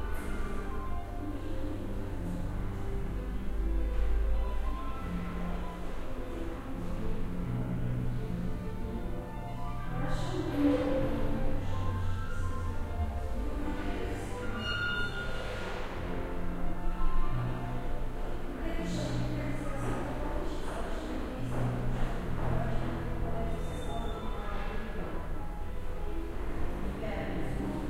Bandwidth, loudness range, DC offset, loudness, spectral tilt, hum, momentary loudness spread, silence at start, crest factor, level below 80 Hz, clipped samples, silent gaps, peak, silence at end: 12.5 kHz; 5 LU; under 0.1%; -36 LUFS; -7 dB/octave; none; 6 LU; 0 s; 16 dB; -34 dBFS; under 0.1%; none; -16 dBFS; 0 s